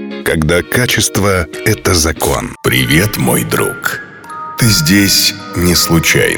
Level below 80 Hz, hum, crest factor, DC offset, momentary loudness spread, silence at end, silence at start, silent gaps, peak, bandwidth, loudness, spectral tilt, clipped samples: -30 dBFS; none; 12 dB; under 0.1%; 8 LU; 0 s; 0 s; none; 0 dBFS; over 20 kHz; -11 LUFS; -3.5 dB/octave; under 0.1%